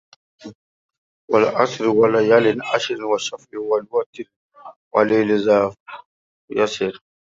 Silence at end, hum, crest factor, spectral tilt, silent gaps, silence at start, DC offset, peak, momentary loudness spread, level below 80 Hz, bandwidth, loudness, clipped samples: 0.4 s; none; 18 dB; -5 dB/octave; 0.55-0.89 s, 0.98-1.28 s, 4.06-4.13 s, 4.36-4.50 s, 4.76-4.91 s, 5.80-5.86 s, 6.06-6.48 s; 0.45 s; under 0.1%; -2 dBFS; 16 LU; -64 dBFS; 7.8 kHz; -19 LUFS; under 0.1%